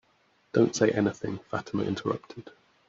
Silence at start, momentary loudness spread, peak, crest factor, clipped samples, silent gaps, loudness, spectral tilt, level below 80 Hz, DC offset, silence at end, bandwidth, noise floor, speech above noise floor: 0.55 s; 12 LU; -10 dBFS; 20 dB; under 0.1%; none; -28 LUFS; -6 dB/octave; -64 dBFS; under 0.1%; 0.4 s; 7.8 kHz; -67 dBFS; 39 dB